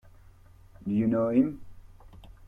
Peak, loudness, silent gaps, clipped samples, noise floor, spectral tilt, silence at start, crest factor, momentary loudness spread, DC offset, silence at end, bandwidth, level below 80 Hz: -12 dBFS; -27 LUFS; none; under 0.1%; -53 dBFS; -10.5 dB/octave; 0.8 s; 18 dB; 16 LU; under 0.1%; 0 s; 3.8 kHz; -54 dBFS